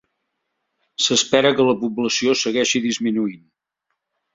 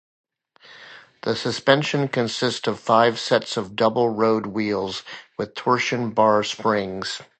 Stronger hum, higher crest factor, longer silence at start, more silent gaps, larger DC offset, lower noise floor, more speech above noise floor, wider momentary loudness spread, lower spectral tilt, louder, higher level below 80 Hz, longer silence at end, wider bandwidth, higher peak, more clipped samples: neither; about the same, 20 dB vs 22 dB; first, 1 s vs 0.7 s; neither; neither; first, -77 dBFS vs -51 dBFS; first, 58 dB vs 29 dB; second, 7 LU vs 12 LU; second, -3 dB/octave vs -4.5 dB/octave; first, -18 LUFS vs -22 LUFS; about the same, -62 dBFS vs -62 dBFS; first, 0.95 s vs 0.15 s; second, 7.8 kHz vs 9 kHz; about the same, -2 dBFS vs -2 dBFS; neither